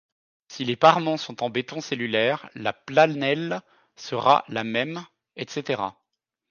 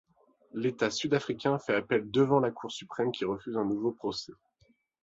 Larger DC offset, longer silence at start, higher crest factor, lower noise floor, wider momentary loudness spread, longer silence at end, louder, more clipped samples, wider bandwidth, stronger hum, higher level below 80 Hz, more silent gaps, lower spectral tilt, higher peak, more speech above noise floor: neither; about the same, 0.5 s vs 0.55 s; about the same, 22 dB vs 18 dB; first, -81 dBFS vs -69 dBFS; first, 15 LU vs 12 LU; about the same, 0.6 s vs 0.7 s; first, -24 LUFS vs -30 LUFS; neither; second, 7.2 kHz vs 8 kHz; neither; about the same, -70 dBFS vs -68 dBFS; neither; about the same, -5 dB/octave vs -5.5 dB/octave; first, -2 dBFS vs -12 dBFS; first, 58 dB vs 39 dB